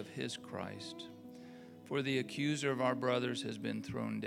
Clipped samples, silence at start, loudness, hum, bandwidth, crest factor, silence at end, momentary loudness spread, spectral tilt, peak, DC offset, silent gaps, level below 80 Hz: under 0.1%; 0 s; -38 LUFS; none; 16 kHz; 20 dB; 0 s; 18 LU; -5 dB/octave; -20 dBFS; under 0.1%; none; -76 dBFS